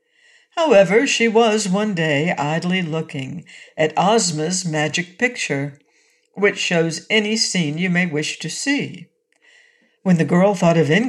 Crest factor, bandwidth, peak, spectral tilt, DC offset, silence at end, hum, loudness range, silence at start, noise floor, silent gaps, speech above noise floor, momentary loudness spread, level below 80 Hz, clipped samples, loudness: 16 dB; 12 kHz; -4 dBFS; -4.5 dB/octave; under 0.1%; 0 s; none; 3 LU; 0.55 s; -60 dBFS; none; 42 dB; 10 LU; -66 dBFS; under 0.1%; -18 LUFS